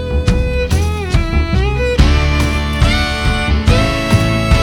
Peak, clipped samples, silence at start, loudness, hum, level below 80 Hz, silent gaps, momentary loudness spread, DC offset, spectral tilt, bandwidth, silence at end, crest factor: 0 dBFS; under 0.1%; 0 s; -14 LUFS; none; -16 dBFS; none; 4 LU; under 0.1%; -5.5 dB/octave; 14 kHz; 0 s; 12 dB